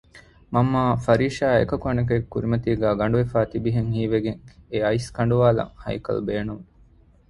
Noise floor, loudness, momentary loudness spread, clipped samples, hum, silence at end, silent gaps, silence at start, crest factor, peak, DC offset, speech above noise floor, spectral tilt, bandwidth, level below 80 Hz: -54 dBFS; -23 LUFS; 10 LU; under 0.1%; none; 0.65 s; none; 0.15 s; 20 dB; -2 dBFS; under 0.1%; 32 dB; -8 dB/octave; 11.5 kHz; -44 dBFS